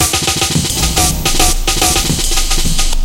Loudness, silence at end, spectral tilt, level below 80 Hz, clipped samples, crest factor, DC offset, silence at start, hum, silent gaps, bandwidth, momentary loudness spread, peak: -12 LUFS; 0 s; -2 dB/octave; -16 dBFS; under 0.1%; 12 dB; under 0.1%; 0 s; none; none; 17 kHz; 3 LU; 0 dBFS